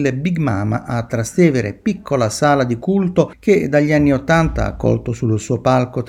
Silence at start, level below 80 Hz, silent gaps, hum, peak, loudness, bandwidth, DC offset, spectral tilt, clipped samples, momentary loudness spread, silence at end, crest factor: 0 s; -36 dBFS; none; none; 0 dBFS; -17 LUFS; 15 kHz; under 0.1%; -6.5 dB/octave; under 0.1%; 6 LU; 0 s; 16 dB